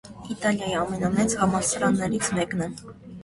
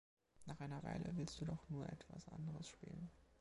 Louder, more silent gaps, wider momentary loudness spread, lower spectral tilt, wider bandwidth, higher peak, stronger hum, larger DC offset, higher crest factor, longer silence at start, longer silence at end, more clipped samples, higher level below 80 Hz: first, -25 LUFS vs -50 LUFS; neither; about the same, 12 LU vs 10 LU; second, -4.5 dB/octave vs -6.5 dB/octave; about the same, 11.5 kHz vs 11.5 kHz; first, -8 dBFS vs -32 dBFS; neither; neither; about the same, 18 dB vs 18 dB; second, 0.05 s vs 0.35 s; about the same, 0 s vs 0.05 s; neither; first, -50 dBFS vs -66 dBFS